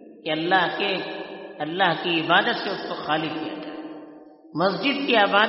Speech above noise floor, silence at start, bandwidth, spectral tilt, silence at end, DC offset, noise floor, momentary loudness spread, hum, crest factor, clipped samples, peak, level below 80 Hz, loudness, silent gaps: 23 dB; 0 s; 5.8 kHz; -1.5 dB/octave; 0 s; under 0.1%; -46 dBFS; 16 LU; none; 20 dB; under 0.1%; -4 dBFS; -70 dBFS; -23 LUFS; none